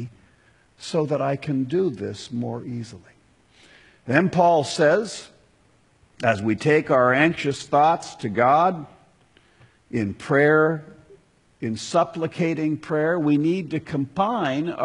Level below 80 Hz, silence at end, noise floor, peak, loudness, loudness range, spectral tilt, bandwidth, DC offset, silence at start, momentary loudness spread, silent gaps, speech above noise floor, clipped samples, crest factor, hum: -62 dBFS; 0 s; -60 dBFS; -2 dBFS; -22 LUFS; 6 LU; -6 dB/octave; 11 kHz; under 0.1%; 0 s; 14 LU; none; 38 dB; under 0.1%; 22 dB; none